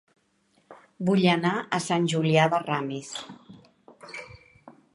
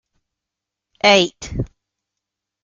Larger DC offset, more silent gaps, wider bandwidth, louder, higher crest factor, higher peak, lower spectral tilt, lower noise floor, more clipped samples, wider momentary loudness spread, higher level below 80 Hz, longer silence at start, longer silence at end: neither; neither; first, 11.5 kHz vs 7.6 kHz; second, -25 LUFS vs -15 LUFS; about the same, 22 dB vs 22 dB; second, -6 dBFS vs -2 dBFS; first, -5.5 dB/octave vs -3.5 dB/octave; second, -67 dBFS vs -84 dBFS; neither; first, 19 LU vs 16 LU; second, -68 dBFS vs -42 dBFS; second, 0.7 s vs 1.05 s; second, 0.25 s vs 1 s